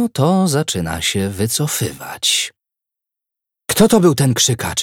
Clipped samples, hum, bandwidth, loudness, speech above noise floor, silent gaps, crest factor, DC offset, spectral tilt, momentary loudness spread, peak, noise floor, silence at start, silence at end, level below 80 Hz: under 0.1%; none; 18 kHz; -16 LUFS; 68 dB; none; 16 dB; under 0.1%; -4 dB/octave; 9 LU; 0 dBFS; -84 dBFS; 0 s; 0 s; -44 dBFS